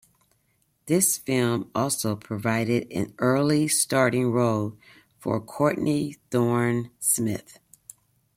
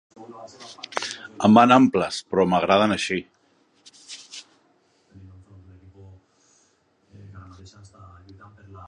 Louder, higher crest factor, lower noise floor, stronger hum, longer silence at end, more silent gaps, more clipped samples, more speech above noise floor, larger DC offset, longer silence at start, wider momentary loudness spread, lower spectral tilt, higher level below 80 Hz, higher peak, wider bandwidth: second, -24 LUFS vs -20 LUFS; second, 18 dB vs 24 dB; first, -69 dBFS vs -64 dBFS; neither; first, 0.95 s vs 0.05 s; neither; neither; about the same, 45 dB vs 44 dB; neither; first, 0.85 s vs 0.2 s; second, 8 LU vs 26 LU; about the same, -4.5 dB/octave vs -5.5 dB/octave; second, -64 dBFS vs -58 dBFS; second, -6 dBFS vs 0 dBFS; first, 16.5 kHz vs 11 kHz